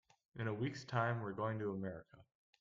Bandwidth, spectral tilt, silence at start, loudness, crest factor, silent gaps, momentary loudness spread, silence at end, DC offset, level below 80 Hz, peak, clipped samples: 7.6 kHz; -7 dB/octave; 0.35 s; -41 LUFS; 20 dB; none; 10 LU; 0.35 s; under 0.1%; -74 dBFS; -22 dBFS; under 0.1%